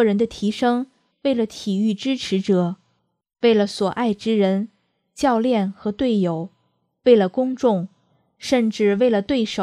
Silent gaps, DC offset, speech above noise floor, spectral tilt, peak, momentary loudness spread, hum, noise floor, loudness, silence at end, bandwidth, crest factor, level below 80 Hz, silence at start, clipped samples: none; under 0.1%; 49 dB; -6 dB/octave; -2 dBFS; 9 LU; none; -69 dBFS; -20 LUFS; 0 s; 11 kHz; 18 dB; -58 dBFS; 0 s; under 0.1%